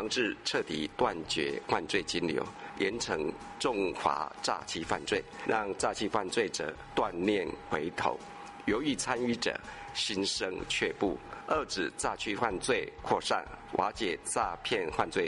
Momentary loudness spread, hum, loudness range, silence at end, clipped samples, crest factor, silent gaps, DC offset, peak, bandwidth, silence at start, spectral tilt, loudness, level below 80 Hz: 5 LU; none; 1 LU; 0 s; under 0.1%; 20 dB; none; under 0.1%; -12 dBFS; 11.5 kHz; 0 s; -3 dB/octave; -33 LUFS; -56 dBFS